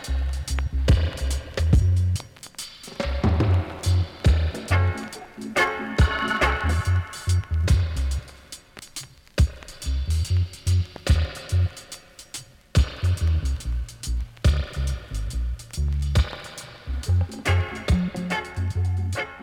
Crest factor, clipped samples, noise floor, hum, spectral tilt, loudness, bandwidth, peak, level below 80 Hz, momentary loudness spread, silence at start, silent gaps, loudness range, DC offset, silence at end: 18 dB; under 0.1%; -44 dBFS; none; -5.5 dB/octave; -25 LUFS; 14.5 kHz; -6 dBFS; -28 dBFS; 15 LU; 0 s; none; 4 LU; under 0.1%; 0 s